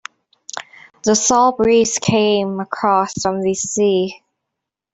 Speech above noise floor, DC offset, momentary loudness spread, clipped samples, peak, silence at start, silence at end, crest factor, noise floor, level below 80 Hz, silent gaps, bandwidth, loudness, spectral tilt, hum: 65 dB; under 0.1%; 14 LU; under 0.1%; -2 dBFS; 0.55 s; 0.8 s; 14 dB; -80 dBFS; -54 dBFS; none; 8.4 kHz; -16 LUFS; -3.5 dB/octave; none